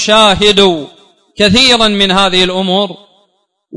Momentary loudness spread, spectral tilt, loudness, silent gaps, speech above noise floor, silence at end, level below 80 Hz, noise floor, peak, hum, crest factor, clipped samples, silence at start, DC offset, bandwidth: 8 LU; -3.5 dB/octave; -8 LUFS; none; 50 dB; 0 s; -36 dBFS; -59 dBFS; 0 dBFS; none; 10 dB; 0.3%; 0 s; under 0.1%; 12 kHz